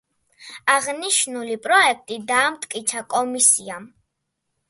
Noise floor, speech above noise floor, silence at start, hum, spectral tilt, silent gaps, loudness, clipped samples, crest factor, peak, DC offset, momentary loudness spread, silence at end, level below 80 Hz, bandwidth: -77 dBFS; 56 dB; 0.4 s; none; 0 dB/octave; none; -19 LUFS; under 0.1%; 20 dB; -2 dBFS; under 0.1%; 13 LU; 0.85 s; -72 dBFS; 12 kHz